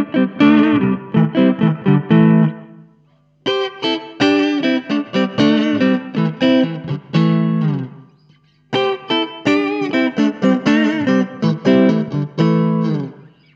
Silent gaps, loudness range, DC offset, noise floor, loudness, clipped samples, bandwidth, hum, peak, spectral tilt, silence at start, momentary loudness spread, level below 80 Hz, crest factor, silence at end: none; 3 LU; under 0.1%; -55 dBFS; -16 LUFS; under 0.1%; 7.4 kHz; none; 0 dBFS; -7.5 dB/octave; 0 s; 8 LU; -58 dBFS; 14 dB; 0.4 s